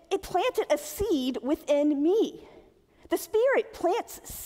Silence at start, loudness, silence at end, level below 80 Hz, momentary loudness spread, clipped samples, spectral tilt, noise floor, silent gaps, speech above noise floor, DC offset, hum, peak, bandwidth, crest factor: 0.1 s; -27 LUFS; 0 s; -54 dBFS; 8 LU; under 0.1%; -4 dB/octave; -57 dBFS; none; 30 dB; under 0.1%; none; -12 dBFS; 16 kHz; 14 dB